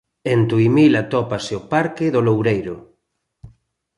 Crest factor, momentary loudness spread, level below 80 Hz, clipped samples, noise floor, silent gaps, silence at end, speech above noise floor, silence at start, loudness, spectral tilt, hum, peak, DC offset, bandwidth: 16 dB; 11 LU; -52 dBFS; under 0.1%; -72 dBFS; none; 0.5 s; 55 dB; 0.25 s; -18 LUFS; -7.5 dB/octave; none; -4 dBFS; under 0.1%; 11 kHz